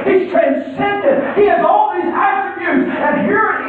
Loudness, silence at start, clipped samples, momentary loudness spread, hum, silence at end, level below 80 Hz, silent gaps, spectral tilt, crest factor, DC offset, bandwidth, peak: -14 LUFS; 0 s; under 0.1%; 5 LU; none; 0 s; -52 dBFS; none; -8.5 dB/octave; 12 dB; under 0.1%; 4.5 kHz; -2 dBFS